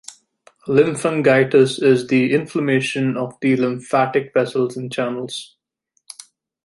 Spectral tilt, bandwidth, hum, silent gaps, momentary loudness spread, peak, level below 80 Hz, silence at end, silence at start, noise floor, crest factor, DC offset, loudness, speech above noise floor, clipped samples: -6 dB/octave; 11.5 kHz; none; none; 15 LU; -2 dBFS; -64 dBFS; 1.2 s; 0.1 s; -69 dBFS; 16 dB; under 0.1%; -18 LUFS; 52 dB; under 0.1%